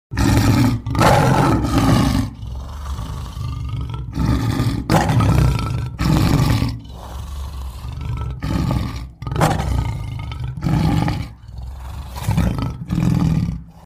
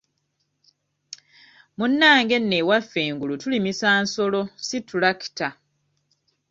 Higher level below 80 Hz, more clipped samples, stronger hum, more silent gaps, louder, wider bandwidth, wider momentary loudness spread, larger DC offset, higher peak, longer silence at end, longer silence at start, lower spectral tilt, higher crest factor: first, -26 dBFS vs -66 dBFS; neither; neither; neither; about the same, -19 LUFS vs -21 LUFS; first, 16 kHz vs 7.8 kHz; about the same, 16 LU vs 15 LU; neither; about the same, -2 dBFS vs -2 dBFS; second, 0.05 s vs 1 s; second, 0.1 s vs 1.8 s; first, -6.5 dB/octave vs -4 dB/octave; about the same, 18 dB vs 20 dB